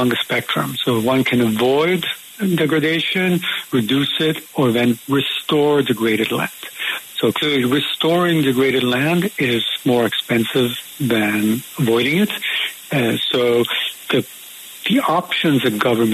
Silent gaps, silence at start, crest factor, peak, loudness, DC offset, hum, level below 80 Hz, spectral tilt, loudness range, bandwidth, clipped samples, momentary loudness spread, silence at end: none; 0 s; 14 dB; -4 dBFS; -18 LUFS; under 0.1%; none; -58 dBFS; -5 dB/octave; 1 LU; 14 kHz; under 0.1%; 5 LU; 0 s